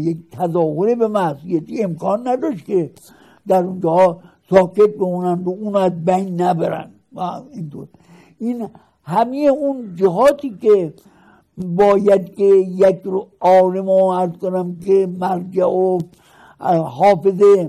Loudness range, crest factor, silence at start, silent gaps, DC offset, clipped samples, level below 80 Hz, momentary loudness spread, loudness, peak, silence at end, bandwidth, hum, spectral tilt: 6 LU; 16 dB; 0 s; none; under 0.1%; under 0.1%; -58 dBFS; 14 LU; -17 LUFS; 0 dBFS; 0 s; 13 kHz; none; -8 dB/octave